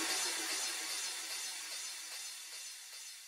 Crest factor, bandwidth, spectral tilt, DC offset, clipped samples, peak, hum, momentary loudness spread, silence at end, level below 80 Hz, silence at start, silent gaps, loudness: 18 dB; 16 kHz; 3 dB/octave; under 0.1%; under 0.1%; -24 dBFS; none; 11 LU; 0 s; under -90 dBFS; 0 s; none; -39 LUFS